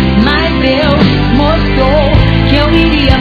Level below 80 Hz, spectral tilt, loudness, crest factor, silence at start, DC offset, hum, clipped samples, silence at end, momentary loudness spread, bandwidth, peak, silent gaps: -16 dBFS; -8 dB/octave; -9 LUFS; 8 dB; 0 s; under 0.1%; none; 2%; 0 s; 2 LU; 5.4 kHz; 0 dBFS; none